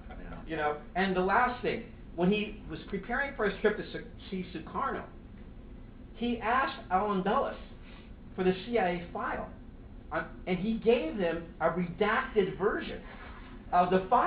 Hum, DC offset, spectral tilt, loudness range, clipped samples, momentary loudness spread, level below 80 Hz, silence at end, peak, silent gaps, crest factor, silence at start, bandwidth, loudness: none; under 0.1%; -4.5 dB/octave; 4 LU; under 0.1%; 22 LU; -50 dBFS; 0 s; -12 dBFS; none; 20 dB; 0 s; 5 kHz; -31 LUFS